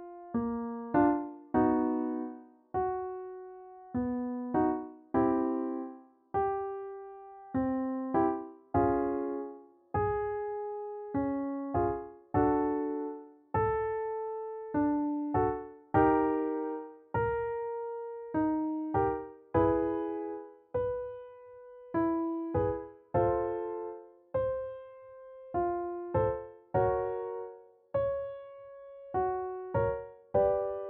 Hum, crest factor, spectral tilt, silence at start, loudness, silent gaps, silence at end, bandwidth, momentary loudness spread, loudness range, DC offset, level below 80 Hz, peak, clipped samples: none; 20 dB; -9 dB/octave; 0 s; -33 LUFS; none; 0 s; 3.6 kHz; 15 LU; 4 LU; under 0.1%; -54 dBFS; -14 dBFS; under 0.1%